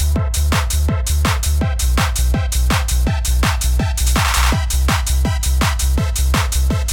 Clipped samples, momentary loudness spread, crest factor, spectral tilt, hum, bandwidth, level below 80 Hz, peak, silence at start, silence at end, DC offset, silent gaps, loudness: under 0.1%; 2 LU; 12 dB; -4 dB/octave; none; 17.5 kHz; -18 dBFS; -2 dBFS; 0 s; 0 s; under 0.1%; none; -17 LUFS